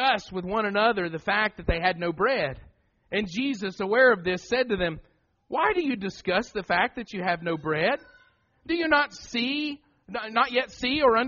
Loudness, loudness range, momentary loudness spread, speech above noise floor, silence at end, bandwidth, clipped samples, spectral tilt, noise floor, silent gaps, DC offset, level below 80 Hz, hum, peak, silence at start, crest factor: -26 LUFS; 2 LU; 9 LU; 36 dB; 0 s; 7.2 kHz; under 0.1%; -2.5 dB/octave; -61 dBFS; none; under 0.1%; -48 dBFS; none; -8 dBFS; 0 s; 18 dB